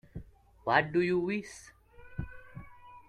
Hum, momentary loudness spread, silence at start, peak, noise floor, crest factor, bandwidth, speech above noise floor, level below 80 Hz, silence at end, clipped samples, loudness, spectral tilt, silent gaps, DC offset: none; 23 LU; 0.15 s; -10 dBFS; -51 dBFS; 24 dB; 11 kHz; 21 dB; -56 dBFS; 0.1 s; under 0.1%; -30 LUFS; -6 dB/octave; none; under 0.1%